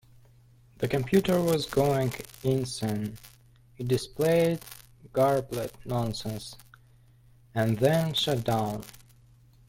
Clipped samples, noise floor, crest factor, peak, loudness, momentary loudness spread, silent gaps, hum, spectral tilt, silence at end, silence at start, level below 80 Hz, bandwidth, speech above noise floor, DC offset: under 0.1%; -58 dBFS; 18 dB; -10 dBFS; -28 LUFS; 14 LU; none; none; -6 dB/octave; 0.8 s; 0.8 s; -56 dBFS; 17 kHz; 31 dB; under 0.1%